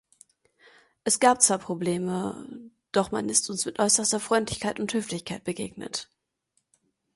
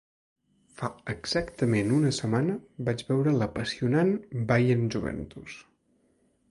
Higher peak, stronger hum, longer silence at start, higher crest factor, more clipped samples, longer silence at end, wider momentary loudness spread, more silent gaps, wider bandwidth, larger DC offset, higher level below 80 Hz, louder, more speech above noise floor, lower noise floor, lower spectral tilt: first, -4 dBFS vs -10 dBFS; neither; first, 1.05 s vs 0.8 s; first, 24 dB vs 18 dB; neither; first, 1.1 s vs 0.9 s; about the same, 13 LU vs 12 LU; neither; about the same, 12 kHz vs 11.5 kHz; neither; second, -62 dBFS vs -54 dBFS; first, -25 LUFS vs -28 LUFS; first, 49 dB vs 41 dB; first, -75 dBFS vs -68 dBFS; second, -3 dB/octave vs -6.5 dB/octave